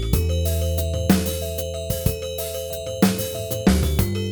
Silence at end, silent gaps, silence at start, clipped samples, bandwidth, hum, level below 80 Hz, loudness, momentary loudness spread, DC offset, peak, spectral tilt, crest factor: 0 s; none; 0 s; under 0.1%; over 20 kHz; none; -28 dBFS; -23 LUFS; 7 LU; under 0.1%; -2 dBFS; -5.5 dB/octave; 20 dB